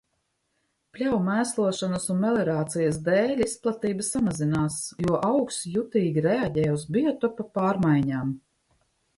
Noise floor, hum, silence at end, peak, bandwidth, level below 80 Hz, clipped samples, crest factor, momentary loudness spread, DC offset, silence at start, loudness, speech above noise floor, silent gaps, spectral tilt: -75 dBFS; none; 0.8 s; -10 dBFS; 12 kHz; -56 dBFS; under 0.1%; 16 dB; 5 LU; under 0.1%; 0.95 s; -25 LUFS; 50 dB; none; -6 dB/octave